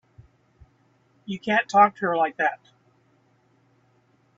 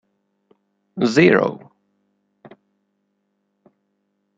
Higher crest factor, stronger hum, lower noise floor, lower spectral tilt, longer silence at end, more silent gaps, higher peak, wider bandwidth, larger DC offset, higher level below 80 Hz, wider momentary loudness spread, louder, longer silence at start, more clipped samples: about the same, 22 dB vs 22 dB; second, none vs 50 Hz at -60 dBFS; second, -63 dBFS vs -72 dBFS; about the same, -5 dB/octave vs -6 dB/octave; second, 1.85 s vs 2.8 s; neither; about the same, -4 dBFS vs -2 dBFS; about the same, 7.8 kHz vs 8 kHz; neither; second, -68 dBFS vs -62 dBFS; second, 21 LU vs 24 LU; second, -22 LUFS vs -16 LUFS; first, 1.3 s vs 0.95 s; neither